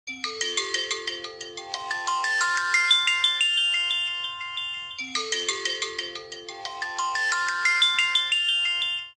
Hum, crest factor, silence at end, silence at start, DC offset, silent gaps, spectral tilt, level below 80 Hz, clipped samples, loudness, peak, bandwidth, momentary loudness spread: none; 18 dB; 0.05 s; 0.05 s; under 0.1%; none; 2 dB/octave; -70 dBFS; under 0.1%; -23 LUFS; -8 dBFS; 13 kHz; 14 LU